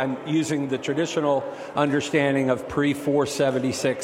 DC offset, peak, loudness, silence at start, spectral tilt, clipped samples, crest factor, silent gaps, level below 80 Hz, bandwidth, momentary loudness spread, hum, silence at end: under 0.1%; -6 dBFS; -24 LUFS; 0 s; -5.5 dB/octave; under 0.1%; 16 dB; none; -60 dBFS; 16 kHz; 4 LU; none; 0 s